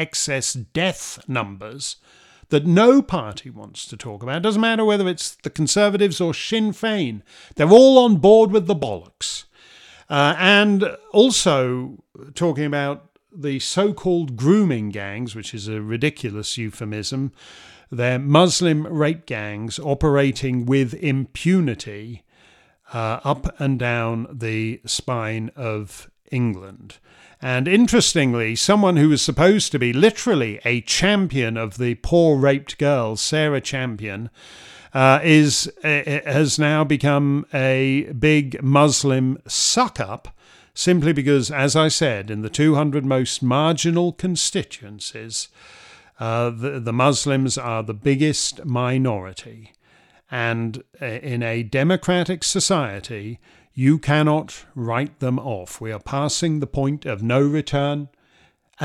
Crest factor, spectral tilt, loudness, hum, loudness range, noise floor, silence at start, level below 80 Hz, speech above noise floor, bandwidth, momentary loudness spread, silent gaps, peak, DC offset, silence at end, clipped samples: 20 dB; -5 dB/octave; -19 LUFS; none; 8 LU; -58 dBFS; 0 s; -48 dBFS; 39 dB; 14 kHz; 15 LU; none; 0 dBFS; under 0.1%; 0 s; under 0.1%